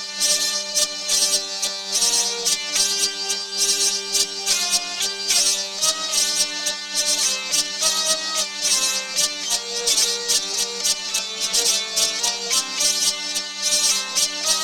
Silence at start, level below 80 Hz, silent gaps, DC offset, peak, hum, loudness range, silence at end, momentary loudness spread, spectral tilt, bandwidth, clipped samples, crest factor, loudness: 0 s; -60 dBFS; none; under 0.1%; -4 dBFS; none; 1 LU; 0 s; 5 LU; 2 dB/octave; 19 kHz; under 0.1%; 18 dB; -19 LUFS